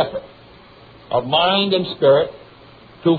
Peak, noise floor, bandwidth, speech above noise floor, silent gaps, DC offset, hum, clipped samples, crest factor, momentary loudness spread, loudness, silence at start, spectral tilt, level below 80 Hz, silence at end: -4 dBFS; -45 dBFS; 4.9 kHz; 28 dB; none; under 0.1%; none; under 0.1%; 16 dB; 10 LU; -17 LUFS; 0 s; -8.5 dB/octave; -54 dBFS; 0 s